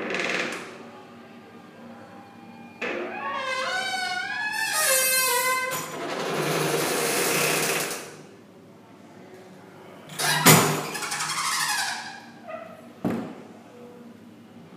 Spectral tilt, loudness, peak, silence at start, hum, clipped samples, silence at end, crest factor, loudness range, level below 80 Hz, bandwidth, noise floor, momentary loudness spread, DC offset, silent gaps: -2.5 dB/octave; -24 LUFS; 0 dBFS; 0 s; none; under 0.1%; 0 s; 28 dB; 9 LU; -72 dBFS; 15.5 kHz; -49 dBFS; 26 LU; under 0.1%; none